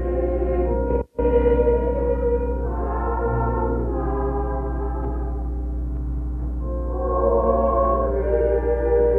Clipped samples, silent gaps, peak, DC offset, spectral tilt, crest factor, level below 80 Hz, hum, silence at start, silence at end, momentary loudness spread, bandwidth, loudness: under 0.1%; none; -8 dBFS; under 0.1%; -11.5 dB/octave; 14 dB; -26 dBFS; 60 Hz at -25 dBFS; 0 s; 0 s; 9 LU; 3.1 kHz; -23 LUFS